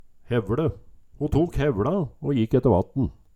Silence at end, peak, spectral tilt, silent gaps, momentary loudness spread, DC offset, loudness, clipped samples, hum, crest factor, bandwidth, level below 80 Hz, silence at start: 0.25 s; -6 dBFS; -9 dB/octave; none; 7 LU; under 0.1%; -24 LUFS; under 0.1%; none; 18 dB; 13 kHz; -40 dBFS; 0.25 s